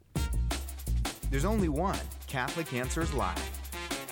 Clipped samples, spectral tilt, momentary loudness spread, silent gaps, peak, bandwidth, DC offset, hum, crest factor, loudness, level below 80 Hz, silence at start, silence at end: under 0.1%; -5 dB/octave; 8 LU; none; -16 dBFS; 19 kHz; under 0.1%; none; 16 dB; -33 LUFS; -36 dBFS; 0.15 s; 0 s